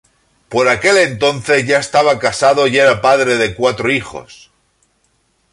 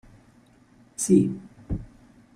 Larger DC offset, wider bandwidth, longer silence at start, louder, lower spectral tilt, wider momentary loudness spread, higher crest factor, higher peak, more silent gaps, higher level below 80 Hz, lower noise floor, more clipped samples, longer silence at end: neither; second, 11.5 kHz vs 15.5 kHz; second, 0.5 s vs 1 s; first, -13 LUFS vs -25 LUFS; second, -3.5 dB/octave vs -6.5 dB/octave; second, 6 LU vs 19 LU; second, 14 dB vs 22 dB; first, 0 dBFS vs -6 dBFS; neither; about the same, -48 dBFS vs -46 dBFS; first, -61 dBFS vs -57 dBFS; neither; first, 1.2 s vs 0.5 s